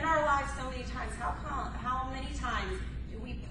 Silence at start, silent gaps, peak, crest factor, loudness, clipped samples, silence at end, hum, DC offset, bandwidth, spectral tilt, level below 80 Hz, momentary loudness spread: 0 s; none; -16 dBFS; 18 dB; -35 LUFS; under 0.1%; 0 s; none; under 0.1%; 11.5 kHz; -5 dB/octave; -40 dBFS; 12 LU